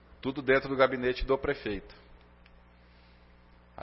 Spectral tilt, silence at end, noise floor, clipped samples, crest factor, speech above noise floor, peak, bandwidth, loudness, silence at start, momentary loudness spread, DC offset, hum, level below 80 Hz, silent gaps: -9 dB/octave; 0 s; -58 dBFS; under 0.1%; 22 dB; 28 dB; -10 dBFS; 5.8 kHz; -29 LUFS; 0.25 s; 11 LU; under 0.1%; 60 Hz at -60 dBFS; -48 dBFS; none